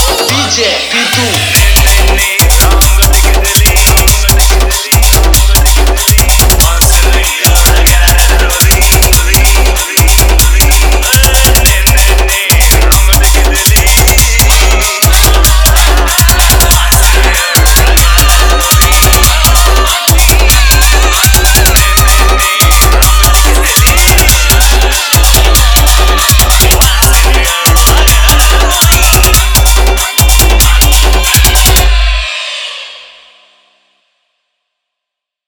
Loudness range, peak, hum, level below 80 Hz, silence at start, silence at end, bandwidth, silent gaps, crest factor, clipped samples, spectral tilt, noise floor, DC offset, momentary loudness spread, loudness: 1 LU; 0 dBFS; 50 Hz at -15 dBFS; -8 dBFS; 0 s; 2.45 s; over 20 kHz; none; 6 dB; 2%; -2.5 dB/octave; -78 dBFS; under 0.1%; 3 LU; -6 LUFS